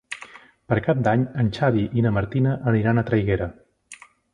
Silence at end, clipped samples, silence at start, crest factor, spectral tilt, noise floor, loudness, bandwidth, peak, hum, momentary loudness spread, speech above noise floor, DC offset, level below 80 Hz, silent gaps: 0.4 s; under 0.1%; 0.1 s; 18 dB; -8 dB/octave; -47 dBFS; -22 LUFS; 10.5 kHz; -4 dBFS; none; 10 LU; 27 dB; under 0.1%; -44 dBFS; none